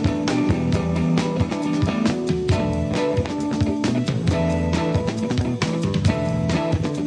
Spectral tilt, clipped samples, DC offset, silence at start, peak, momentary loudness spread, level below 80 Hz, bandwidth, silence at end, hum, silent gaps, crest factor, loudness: -6.5 dB/octave; under 0.1%; under 0.1%; 0 s; -4 dBFS; 2 LU; -36 dBFS; 10.5 kHz; 0 s; none; none; 16 dB; -22 LUFS